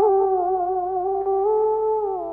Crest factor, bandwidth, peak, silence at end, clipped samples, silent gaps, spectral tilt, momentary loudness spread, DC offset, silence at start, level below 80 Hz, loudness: 12 dB; 2.3 kHz; -8 dBFS; 0 s; under 0.1%; none; -10.5 dB/octave; 4 LU; under 0.1%; 0 s; -54 dBFS; -22 LUFS